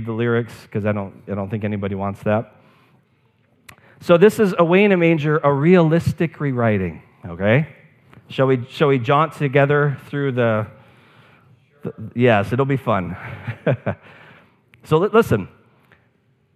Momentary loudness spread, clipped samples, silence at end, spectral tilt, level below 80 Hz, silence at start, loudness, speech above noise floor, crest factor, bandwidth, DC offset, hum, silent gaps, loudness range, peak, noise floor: 16 LU; under 0.1%; 1.1 s; -8 dB/octave; -54 dBFS; 0 s; -18 LUFS; 43 dB; 20 dB; 14.5 kHz; under 0.1%; none; none; 6 LU; 0 dBFS; -61 dBFS